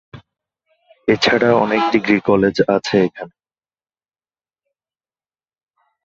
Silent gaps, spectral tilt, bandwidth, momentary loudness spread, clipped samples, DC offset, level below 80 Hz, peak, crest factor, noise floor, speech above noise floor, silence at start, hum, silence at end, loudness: none; -5.5 dB/octave; 7.8 kHz; 9 LU; under 0.1%; under 0.1%; -54 dBFS; -2 dBFS; 18 dB; under -90 dBFS; over 75 dB; 0.15 s; none; 2.75 s; -16 LUFS